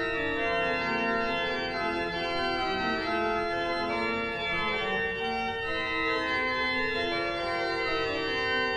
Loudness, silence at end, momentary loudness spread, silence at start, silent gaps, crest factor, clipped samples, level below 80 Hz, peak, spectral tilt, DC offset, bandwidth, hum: -29 LUFS; 0 s; 3 LU; 0 s; none; 12 dB; under 0.1%; -50 dBFS; -16 dBFS; -4.5 dB/octave; under 0.1%; 11 kHz; none